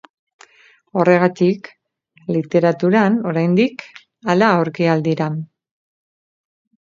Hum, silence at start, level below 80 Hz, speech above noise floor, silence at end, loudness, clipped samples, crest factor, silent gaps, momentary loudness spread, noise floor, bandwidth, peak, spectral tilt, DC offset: none; 0.95 s; -66 dBFS; 39 dB; 1.4 s; -17 LUFS; under 0.1%; 18 dB; none; 14 LU; -55 dBFS; 7.4 kHz; 0 dBFS; -7.5 dB/octave; under 0.1%